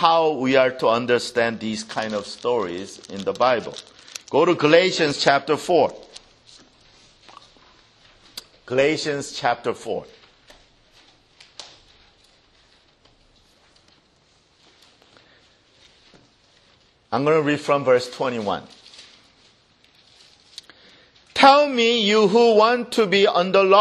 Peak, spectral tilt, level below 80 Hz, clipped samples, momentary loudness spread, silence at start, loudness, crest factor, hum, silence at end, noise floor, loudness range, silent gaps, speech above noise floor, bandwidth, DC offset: 0 dBFS; -4 dB/octave; -64 dBFS; under 0.1%; 22 LU; 0 s; -19 LUFS; 22 dB; none; 0 s; -60 dBFS; 12 LU; none; 41 dB; 12.5 kHz; under 0.1%